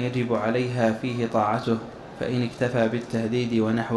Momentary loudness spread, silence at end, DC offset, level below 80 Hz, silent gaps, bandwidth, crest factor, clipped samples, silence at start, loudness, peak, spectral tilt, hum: 5 LU; 0 s; under 0.1%; -56 dBFS; none; 11.5 kHz; 16 dB; under 0.1%; 0 s; -25 LUFS; -8 dBFS; -7 dB/octave; none